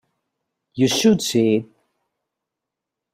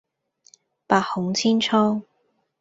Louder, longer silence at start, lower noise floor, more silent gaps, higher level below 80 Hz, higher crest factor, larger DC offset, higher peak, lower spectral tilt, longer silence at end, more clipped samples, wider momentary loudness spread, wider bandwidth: first, -18 LUFS vs -21 LUFS; second, 0.75 s vs 0.9 s; first, -84 dBFS vs -69 dBFS; neither; about the same, -60 dBFS vs -64 dBFS; about the same, 18 dB vs 22 dB; neither; second, -6 dBFS vs -2 dBFS; about the same, -4.5 dB/octave vs -4.5 dB/octave; first, 1.5 s vs 0.6 s; neither; about the same, 7 LU vs 5 LU; first, 16 kHz vs 7.8 kHz